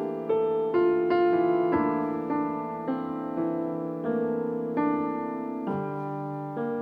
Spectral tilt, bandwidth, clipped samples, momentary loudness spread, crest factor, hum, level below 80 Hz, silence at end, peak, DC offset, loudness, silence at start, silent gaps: -9.5 dB/octave; 5 kHz; under 0.1%; 9 LU; 14 dB; none; -64 dBFS; 0 s; -12 dBFS; under 0.1%; -28 LUFS; 0 s; none